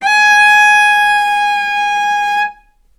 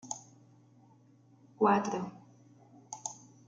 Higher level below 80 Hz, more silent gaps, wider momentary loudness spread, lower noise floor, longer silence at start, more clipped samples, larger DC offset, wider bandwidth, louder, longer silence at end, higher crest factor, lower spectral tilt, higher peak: first, -52 dBFS vs -80 dBFS; neither; second, 9 LU vs 16 LU; second, -38 dBFS vs -62 dBFS; about the same, 0 s vs 0.05 s; neither; neither; first, 15 kHz vs 9.4 kHz; first, -10 LUFS vs -33 LUFS; about the same, 0.45 s vs 0.35 s; second, 12 dB vs 22 dB; second, 2 dB/octave vs -5 dB/octave; first, 0 dBFS vs -14 dBFS